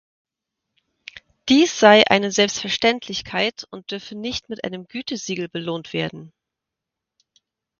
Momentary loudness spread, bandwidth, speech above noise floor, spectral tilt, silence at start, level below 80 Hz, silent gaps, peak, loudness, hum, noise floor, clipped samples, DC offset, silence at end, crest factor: 19 LU; 7.4 kHz; 64 dB; -3.5 dB/octave; 1.15 s; -58 dBFS; none; 0 dBFS; -20 LUFS; none; -85 dBFS; under 0.1%; under 0.1%; 1.5 s; 22 dB